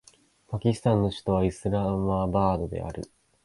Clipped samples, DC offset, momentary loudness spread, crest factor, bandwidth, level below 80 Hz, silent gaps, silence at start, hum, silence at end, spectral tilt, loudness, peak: under 0.1%; under 0.1%; 12 LU; 18 dB; 11.5 kHz; -44 dBFS; none; 0.5 s; none; 0.4 s; -8 dB/octave; -27 LUFS; -10 dBFS